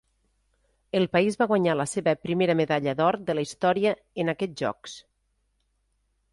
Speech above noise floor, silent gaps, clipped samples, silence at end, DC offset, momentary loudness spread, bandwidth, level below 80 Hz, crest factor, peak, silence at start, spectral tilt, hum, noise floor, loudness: 48 dB; none; under 0.1%; 1.3 s; under 0.1%; 8 LU; 11.5 kHz; -64 dBFS; 18 dB; -8 dBFS; 0.95 s; -5.5 dB/octave; none; -73 dBFS; -25 LUFS